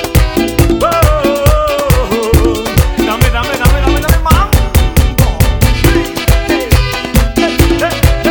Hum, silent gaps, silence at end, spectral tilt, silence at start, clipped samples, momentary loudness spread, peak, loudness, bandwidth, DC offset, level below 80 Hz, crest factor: none; none; 0 s; -5.5 dB/octave; 0 s; under 0.1%; 3 LU; 0 dBFS; -11 LUFS; over 20 kHz; 0.3%; -14 dBFS; 10 dB